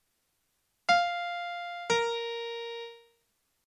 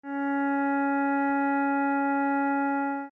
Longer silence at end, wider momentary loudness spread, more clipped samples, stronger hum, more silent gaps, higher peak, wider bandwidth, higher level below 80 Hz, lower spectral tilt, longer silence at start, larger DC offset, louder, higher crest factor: first, 0.65 s vs 0.05 s; first, 13 LU vs 2 LU; neither; neither; neither; first, -12 dBFS vs -18 dBFS; first, 11 kHz vs 3.8 kHz; first, -72 dBFS vs -78 dBFS; second, -1.5 dB/octave vs -7 dB/octave; first, 0.9 s vs 0.05 s; neither; second, -31 LUFS vs -26 LUFS; first, 22 dB vs 8 dB